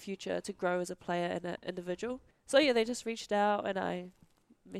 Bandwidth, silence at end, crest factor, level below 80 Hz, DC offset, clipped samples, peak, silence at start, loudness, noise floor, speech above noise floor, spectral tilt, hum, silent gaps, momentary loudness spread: 14 kHz; 0 s; 20 dB; -70 dBFS; under 0.1%; under 0.1%; -14 dBFS; 0 s; -33 LUFS; -62 dBFS; 29 dB; -4.5 dB/octave; none; none; 12 LU